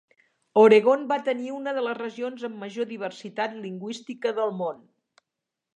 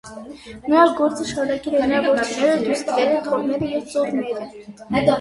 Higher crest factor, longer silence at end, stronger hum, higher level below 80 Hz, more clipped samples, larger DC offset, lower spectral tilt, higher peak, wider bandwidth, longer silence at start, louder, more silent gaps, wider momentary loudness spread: about the same, 20 dB vs 18 dB; first, 1 s vs 0 s; neither; second, -82 dBFS vs -52 dBFS; neither; neither; about the same, -5.5 dB/octave vs -5 dB/octave; second, -6 dBFS vs -2 dBFS; second, 8.8 kHz vs 11.5 kHz; first, 0.55 s vs 0.05 s; second, -25 LUFS vs -20 LUFS; neither; about the same, 18 LU vs 17 LU